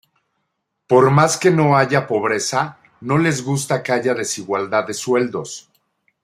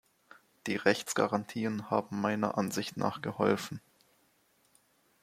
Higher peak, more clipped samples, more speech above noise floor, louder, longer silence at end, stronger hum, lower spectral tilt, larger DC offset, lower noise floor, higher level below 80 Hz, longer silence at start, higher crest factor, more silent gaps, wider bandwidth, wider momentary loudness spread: first, -2 dBFS vs -10 dBFS; neither; first, 57 dB vs 38 dB; first, -18 LUFS vs -32 LUFS; second, 0.65 s vs 1.45 s; neither; about the same, -5 dB/octave vs -5 dB/octave; neither; first, -74 dBFS vs -70 dBFS; first, -60 dBFS vs -74 dBFS; first, 0.9 s vs 0.65 s; second, 16 dB vs 24 dB; neither; about the same, 15 kHz vs 16 kHz; first, 10 LU vs 7 LU